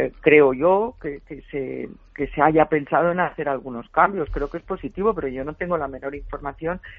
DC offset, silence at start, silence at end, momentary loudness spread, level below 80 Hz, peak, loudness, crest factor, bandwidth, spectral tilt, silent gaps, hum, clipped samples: under 0.1%; 0 s; 0.05 s; 16 LU; -42 dBFS; 0 dBFS; -22 LUFS; 22 dB; 3.9 kHz; -5.5 dB/octave; none; none; under 0.1%